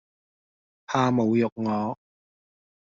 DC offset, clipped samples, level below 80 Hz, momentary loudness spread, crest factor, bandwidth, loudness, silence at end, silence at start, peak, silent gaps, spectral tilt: under 0.1%; under 0.1%; -66 dBFS; 10 LU; 20 dB; 7.4 kHz; -25 LUFS; 0.9 s; 0.9 s; -8 dBFS; 1.52-1.56 s; -6.5 dB/octave